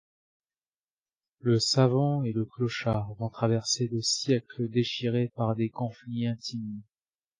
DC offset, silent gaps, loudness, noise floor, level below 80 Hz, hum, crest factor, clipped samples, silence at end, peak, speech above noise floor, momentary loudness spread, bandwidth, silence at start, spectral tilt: under 0.1%; none; -28 LUFS; under -90 dBFS; -62 dBFS; none; 20 dB; under 0.1%; 0.55 s; -10 dBFS; over 62 dB; 11 LU; 10 kHz; 1.45 s; -5 dB/octave